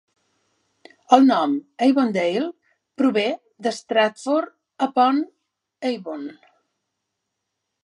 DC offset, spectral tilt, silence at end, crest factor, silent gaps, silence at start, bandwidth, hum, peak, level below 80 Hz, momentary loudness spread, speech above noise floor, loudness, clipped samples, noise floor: under 0.1%; -5 dB/octave; 1.5 s; 22 dB; none; 1.1 s; 11 kHz; none; 0 dBFS; -78 dBFS; 14 LU; 60 dB; -21 LUFS; under 0.1%; -79 dBFS